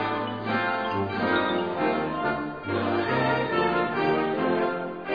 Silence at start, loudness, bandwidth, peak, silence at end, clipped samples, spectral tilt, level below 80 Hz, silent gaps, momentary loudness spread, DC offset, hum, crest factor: 0 s; -26 LUFS; 5.2 kHz; -10 dBFS; 0 s; under 0.1%; -8 dB/octave; -56 dBFS; none; 4 LU; 0.1%; none; 16 dB